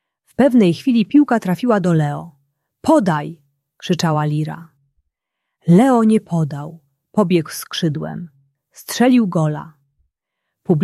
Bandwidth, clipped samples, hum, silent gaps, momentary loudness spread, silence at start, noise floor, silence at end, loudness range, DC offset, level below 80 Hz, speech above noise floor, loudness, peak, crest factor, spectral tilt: 14 kHz; under 0.1%; none; none; 18 LU; 0.4 s; -79 dBFS; 0 s; 4 LU; under 0.1%; -60 dBFS; 63 dB; -17 LUFS; -2 dBFS; 16 dB; -7 dB/octave